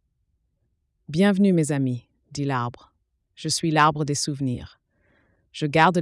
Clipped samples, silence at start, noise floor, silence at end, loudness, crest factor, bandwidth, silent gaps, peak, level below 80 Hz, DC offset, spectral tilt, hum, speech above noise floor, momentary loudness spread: under 0.1%; 1.1 s; -72 dBFS; 0 s; -23 LUFS; 18 dB; 12 kHz; none; -6 dBFS; -58 dBFS; under 0.1%; -5 dB/octave; none; 50 dB; 16 LU